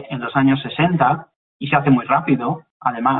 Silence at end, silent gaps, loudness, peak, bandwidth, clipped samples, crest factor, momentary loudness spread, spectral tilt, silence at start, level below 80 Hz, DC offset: 0 s; 1.36-1.60 s, 2.71-2.80 s; -18 LUFS; -2 dBFS; 4.1 kHz; under 0.1%; 16 dB; 9 LU; -11.5 dB/octave; 0 s; -54 dBFS; under 0.1%